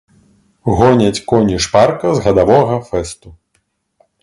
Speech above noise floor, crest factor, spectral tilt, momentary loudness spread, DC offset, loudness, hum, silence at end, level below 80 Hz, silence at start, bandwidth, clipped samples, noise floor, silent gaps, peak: 52 dB; 14 dB; -6 dB/octave; 11 LU; under 0.1%; -13 LUFS; none; 0.9 s; -36 dBFS; 0.65 s; 11.5 kHz; under 0.1%; -64 dBFS; none; 0 dBFS